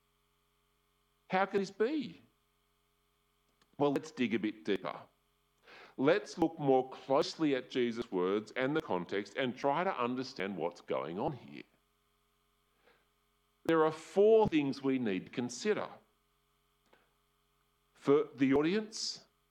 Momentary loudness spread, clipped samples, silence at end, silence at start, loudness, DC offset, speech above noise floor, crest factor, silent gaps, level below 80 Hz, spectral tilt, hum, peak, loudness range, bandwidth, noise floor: 10 LU; under 0.1%; 0.3 s; 1.3 s; -33 LUFS; under 0.1%; 43 dB; 20 dB; none; -72 dBFS; -5.5 dB/octave; none; -16 dBFS; 7 LU; 11 kHz; -76 dBFS